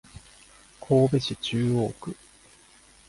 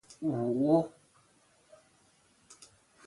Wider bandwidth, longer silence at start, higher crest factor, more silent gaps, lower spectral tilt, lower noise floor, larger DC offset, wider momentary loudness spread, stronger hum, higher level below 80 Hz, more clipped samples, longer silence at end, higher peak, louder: about the same, 11.5 kHz vs 11.5 kHz; about the same, 0.15 s vs 0.2 s; about the same, 18 dB vs 22 dB; neither; second, -6.5 dB/octave vs -8.5 dB/octave; second, -55 dBFS vs -67 dBFS; neither; second, 20 LU vs 27 LU; neither; first, -56 dBFS vs -72 dBFS; neither; first, 0.95 s vs 0.55 s; about the same, -10 dBFS vs -12 dBFS; first, -25 LUFS vs -30 LUFS